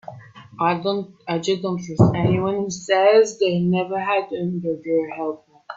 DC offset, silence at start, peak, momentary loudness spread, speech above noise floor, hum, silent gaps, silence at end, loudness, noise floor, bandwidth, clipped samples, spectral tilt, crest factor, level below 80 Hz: under 0.1%; 0.1 s; -2 dBFS; 12 LU; 22 dB; none; none; 0 s; -21 LUFS; -42 dBFS; 7.8 kHz; under 0.1%; -6 dB/octave; 20 dB; -56 dBFS